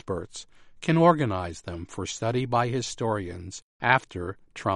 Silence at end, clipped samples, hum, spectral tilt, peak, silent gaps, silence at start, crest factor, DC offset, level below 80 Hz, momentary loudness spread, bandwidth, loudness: 0 s; under 0.1%; none; -5.5 dB/octave; -4 dBFS; 3.62-3.80 s; 0.05 s; 24 dB; under 0.1%; -54 dBFS; 17 LU; 11 kHz; -27 LUFS